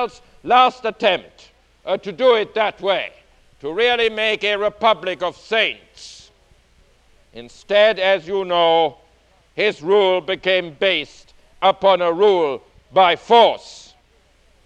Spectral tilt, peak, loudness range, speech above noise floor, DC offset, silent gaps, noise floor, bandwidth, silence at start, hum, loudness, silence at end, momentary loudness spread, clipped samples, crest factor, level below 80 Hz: -4 dB/octave; 0 dBFS; 4 LU; 38 dB; under 0.1%; none; -56 dBFS; 9.4 kHz; 0 s; none; -17 LUFS; 0.9 s; 17 LU; under 0.1%; 18 dB; -56 dBFS